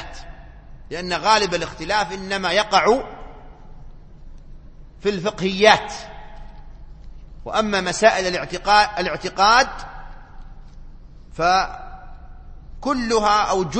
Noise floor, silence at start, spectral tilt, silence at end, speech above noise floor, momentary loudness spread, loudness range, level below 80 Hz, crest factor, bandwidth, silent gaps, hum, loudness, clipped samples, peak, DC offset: -40 dBFS; 0 s; -3 dB/octave; 0 s; 21 dB; 23 LU; 4 LU; -40 dBFS; 22 dB; 8.8 kHz; none; none; -19 LUFS; under 0.1%; 0 dBFS; under 0.1%